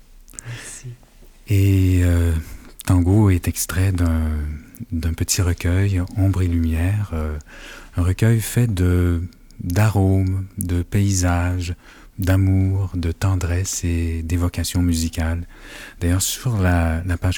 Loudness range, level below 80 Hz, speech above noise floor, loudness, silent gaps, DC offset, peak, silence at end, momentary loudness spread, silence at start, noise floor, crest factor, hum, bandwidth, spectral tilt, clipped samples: 2 LU; -34 dBFS; 27 dB; -20 LUFS; none; under 0.1%; 0 dBFS; 0 s; 16 LU; 0.35 s; -46 dBFS; 20 dB; none; 19 kHz; -6 dB/octave; under 0.1%